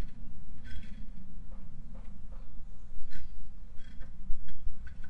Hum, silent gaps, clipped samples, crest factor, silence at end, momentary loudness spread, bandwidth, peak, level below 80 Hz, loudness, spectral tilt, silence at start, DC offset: none; none; under 0.1%; 12 dB; 0 s; 6 LU; 3.5 kHz; -12 dBFS; -42 dBFS; -50 LUFS; -7 dB/octave; 0 s; under 0.1%